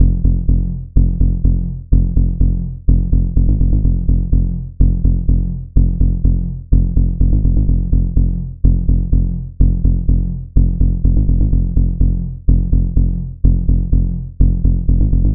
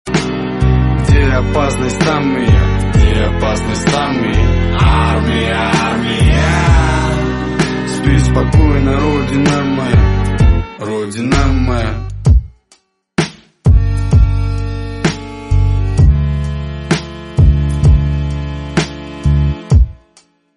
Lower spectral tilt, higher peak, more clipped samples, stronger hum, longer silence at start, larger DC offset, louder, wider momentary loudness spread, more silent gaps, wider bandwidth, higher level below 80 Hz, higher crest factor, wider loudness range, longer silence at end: first, -16.5 dB/octave vs -6.5 dB/octave; about the same, 0 dBFS vs 0 dBFS; neither; neither; about the same, 0 s vs 0.05 s; first, 4% vs 0.2%; second, -17 LUFS vs -14 LUFS; second, 3 LU vs 7 LU; neither; second, 1 kHz vs 11.5 kHz; about the same, -14 dBFS vs -16 dBFS; about the same, 12 dB vs 12 dB; about the same, 1 LU vs 3 LU; second, 0 s vs 0.65 s